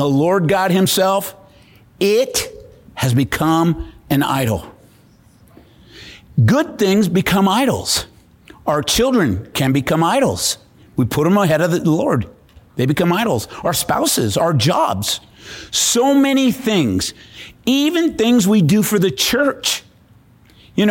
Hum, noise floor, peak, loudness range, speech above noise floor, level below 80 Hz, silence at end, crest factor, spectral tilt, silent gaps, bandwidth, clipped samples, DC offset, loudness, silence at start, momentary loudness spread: none; -49 dBFS; -4 dBFS; 3 LU; 33 dB; -44 dBFS; 0 s; 12 dB; -4.5 dB/octave; none; 17 kHz; under 0.1%; under 0.1%; -16 LUFS; 0 s; 10 LU